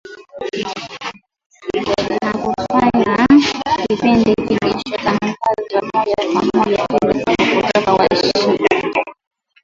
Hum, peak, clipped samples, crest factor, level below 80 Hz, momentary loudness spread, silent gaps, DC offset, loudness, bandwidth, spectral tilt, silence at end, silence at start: none; 0 dBFS; under 0.1%; 16 dB; -46 dBFS; 12 LU; 1.46-1.50 s; under 0.1%; -16 LUFS; 7.8 kHz; -5.5 dB/octave; 0.5 s; 0.05 s